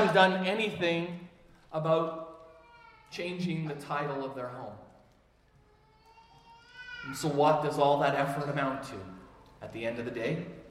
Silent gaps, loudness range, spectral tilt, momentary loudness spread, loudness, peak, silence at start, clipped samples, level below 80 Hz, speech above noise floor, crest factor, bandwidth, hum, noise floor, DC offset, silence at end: none; 10 LU; -5.5 dB/octave; 20 LU; -31 LUFS; -8 dBFS; 0 s; under 0.1%; -66 dBFS; 34 dB; 24 dB; 15 kHz; none; -64 dBFS; under 0.1%; 0 s